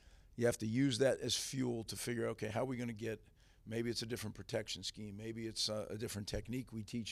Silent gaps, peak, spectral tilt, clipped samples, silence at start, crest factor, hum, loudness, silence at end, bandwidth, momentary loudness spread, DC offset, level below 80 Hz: none; -20 dBFS; -4.5 dB/octave; under 0.1%; 0.05 s; 20 dB; none; -40 LUFS; 0 s; 15.5 kHz; 10 LU; under 0.1%; -62 dBFS